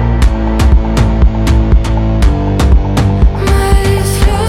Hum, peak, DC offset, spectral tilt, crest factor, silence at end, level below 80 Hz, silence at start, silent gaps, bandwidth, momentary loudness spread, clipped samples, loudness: none; 0 dBFS; under 0.1%; -6.5 dB/octave; 8 dB; 0 s; -10 dBFS; 0 s; none; 14.5 kHz; 2 LU; under 0.1%; -11 LUFS